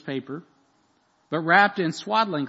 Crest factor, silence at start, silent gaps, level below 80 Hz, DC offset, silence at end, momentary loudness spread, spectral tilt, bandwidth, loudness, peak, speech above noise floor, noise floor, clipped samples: 22 dB; 0.05 s; none; -76 dBFS; under 0.1%; 0 s; 18 LU; -5 dB/octave; 8 kHz; -22 LUFS; -4 dBFS; 42 dB; -65 dBFS; under 0.1%